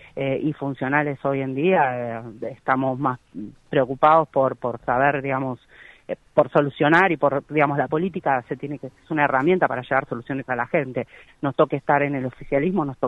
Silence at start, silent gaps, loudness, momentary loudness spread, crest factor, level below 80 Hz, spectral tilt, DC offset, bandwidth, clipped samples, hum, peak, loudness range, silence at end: 0.15 s; none; -22 LUFS; 13 LU; 18 dB; -56 dBFS; -8.5 dB/octave; under 0.1%; 8.2 kHz; under 0.1%; none; -4 dBFS; 3 LU; 0 s